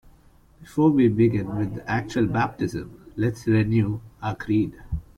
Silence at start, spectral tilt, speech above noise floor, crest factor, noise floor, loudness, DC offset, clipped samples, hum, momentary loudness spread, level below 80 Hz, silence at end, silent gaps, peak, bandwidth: 0.6 s; -8 dB/octave; 31 dB; 16 dB; -54 dBFS; -24 LUFS; under 0.1%; under 0.1%; none; 13 LU; -44 dBFS; 0.15 s; none; -8 dBFS; 11 kHz